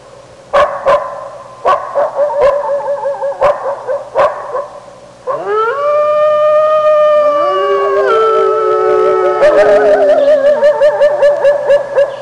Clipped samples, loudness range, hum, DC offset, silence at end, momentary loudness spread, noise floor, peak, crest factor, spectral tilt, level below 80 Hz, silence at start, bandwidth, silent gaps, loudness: under 0.1%; 6 LU; none; under 0.1%; 0 s; 10 LU; -36 dBFS; -2 dBFS; 8 dB; -4.5 dB/octave; -48 dBFS; 0.5 s; 10 kHz; none; -11 LUFS